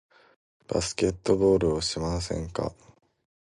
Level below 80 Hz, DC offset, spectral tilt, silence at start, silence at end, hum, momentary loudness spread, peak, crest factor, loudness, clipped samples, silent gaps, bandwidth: -44 dBFS; under 0.1%; -5 dB/octave; 0.7 s; 0.7 s; none; 10 LU; -8 dBFS; 20 dB; -27 LUFS; under 0.1%; none; 11.5 kHz